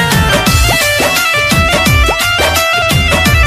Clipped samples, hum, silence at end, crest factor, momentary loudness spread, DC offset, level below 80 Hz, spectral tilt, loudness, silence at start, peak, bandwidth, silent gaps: under 0.1%; none; 0 s; 10 dB; 1 LU; under 0.1%; -20 dBFS; -3.5 dB/octave; -9 LUFS; 0 s; 0 dBFS; 16 kHz; none